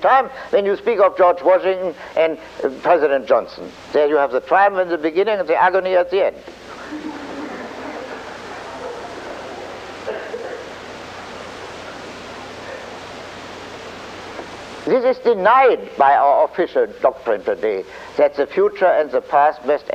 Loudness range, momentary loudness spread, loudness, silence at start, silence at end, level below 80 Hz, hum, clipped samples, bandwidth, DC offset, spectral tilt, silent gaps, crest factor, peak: 15 LU; 18 LU; -17 LUFS; 0 s; 0 s; -56 dBFS; none; under 0.1%; 9.4 kHz; under 0.1%; -5 dB/octave; none; 16 dB; -2 dBFS